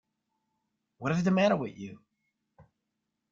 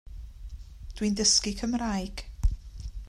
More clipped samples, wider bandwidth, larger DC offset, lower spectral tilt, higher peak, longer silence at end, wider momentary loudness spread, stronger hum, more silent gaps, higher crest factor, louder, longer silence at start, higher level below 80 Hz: neither; second, 7.4 kHz vs 14 kHz; neither; first, -7 dB/octave vs -3 dB/octave; second, -14 dBFS vs -8 dBFS; first, 1.35 s vs 0 s; second, 19 LU vs 24 LU; neither; neither; about the same, 18 dB vs 22 dB; about the same, -28 LUFS vs -27 LUFS; first, 1 s vs 0.05 s; second, -68 dBFS vs -36 dBFS